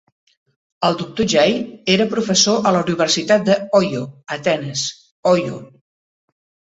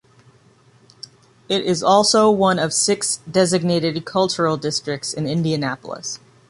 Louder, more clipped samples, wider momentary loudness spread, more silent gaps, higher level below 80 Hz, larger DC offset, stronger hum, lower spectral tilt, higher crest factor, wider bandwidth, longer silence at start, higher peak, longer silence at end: about the same, -17 LUFS vs -19 LUFS; neither; second, 9 LU vs 14 LU; first, 5.11-5.23 s vs none; about the same, -56 dBFS vs -60 dBFS; neither; neither; about the same, -4 dB/octave vs -4 dB/octave; about the same, 18 dB vs 18 dB; second, 8 kHz vs 11.5 kHz; second, 0.8 s vs 1.5 s; about the same, -2 dBFS vs -2 dBFS; first, 1 s vs 0.35 s